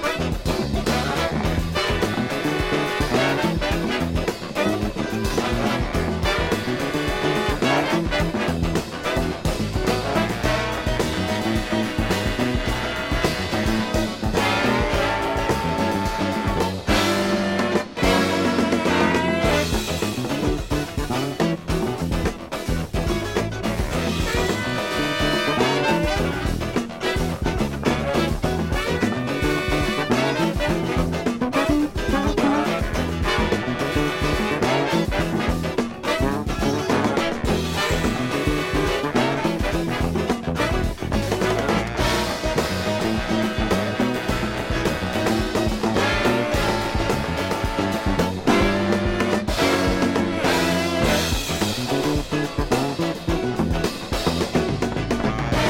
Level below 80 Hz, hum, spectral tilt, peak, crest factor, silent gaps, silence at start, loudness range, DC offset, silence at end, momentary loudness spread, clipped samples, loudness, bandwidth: -32 dBFS; none; -5 dB/octave; -6 dBFS; 16 dB; none; 0 s; 2 LU; under 0.1%; 0 s; 5 LU; under 0.1%; -22 LUFS; 16.5 kHz